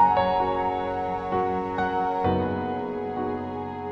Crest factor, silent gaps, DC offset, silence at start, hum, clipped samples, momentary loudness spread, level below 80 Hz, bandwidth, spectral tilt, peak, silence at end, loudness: 16 dB; none; under 0.1%; 0 s; none; under 0.1%; 7 LU; -50 dBFS; 7.4 kHz; -8 dB/octave; -8 dBFS; 0 s; -26 LUFS